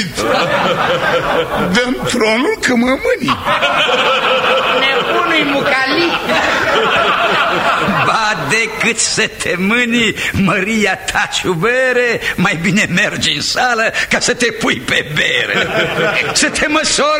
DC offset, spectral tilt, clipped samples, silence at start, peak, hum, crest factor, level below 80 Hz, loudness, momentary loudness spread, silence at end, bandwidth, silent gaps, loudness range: under 0.1%; -3 dB/octave; under 0.1%; 0 s; 0 dBFS; none; 14 dB; -40 dBFS; -13 LUFS; 3 LU; 0 s; 16 kHz; none; 1 LU